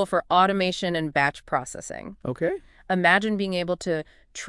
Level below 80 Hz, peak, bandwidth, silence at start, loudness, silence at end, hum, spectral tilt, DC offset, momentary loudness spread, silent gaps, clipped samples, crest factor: -56 dBFS; -4 dBFS; 12 kHz; 0 s; -24 LUFS; 0 s; none; -4.5 dB/octave; under 0.1%; 15 LU; none; under 0.1%; 22 dB